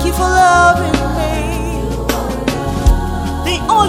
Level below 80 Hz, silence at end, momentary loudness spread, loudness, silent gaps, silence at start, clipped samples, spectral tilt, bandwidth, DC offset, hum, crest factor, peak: -20 dBFS; 0 s; 10 LU; -14 LUFS; none; 0 s; under 0.1%; -5 dB/octave; 16.5 kHz; under 0.1%; none; 14 dB; 0 dBFS